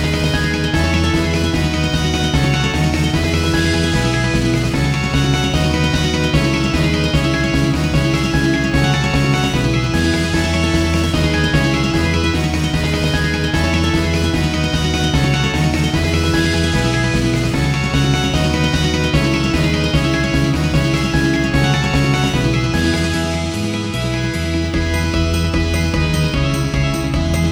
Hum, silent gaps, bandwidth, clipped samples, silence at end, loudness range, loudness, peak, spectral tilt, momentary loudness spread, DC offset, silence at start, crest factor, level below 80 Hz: none; none; over 20 kHz; under 0.1%; 0 s; 2 LU; -16 LUFS; -2 dBFS; -5.5 dB/octave; 2 LU; under 0.1%; 0 s; 14 dB; -24 dBFS